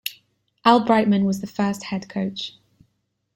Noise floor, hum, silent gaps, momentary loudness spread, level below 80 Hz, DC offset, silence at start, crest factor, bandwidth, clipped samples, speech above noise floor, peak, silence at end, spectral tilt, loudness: -72 dBFS; none; none; 15 LU; -62 dBFS; under 0.1%; 0.05 s; 20 dB; 16 kHz; under 0.1%; 52 dB; -2 dBFS; 0.85 s; -6 dB/octave; -21 LUFS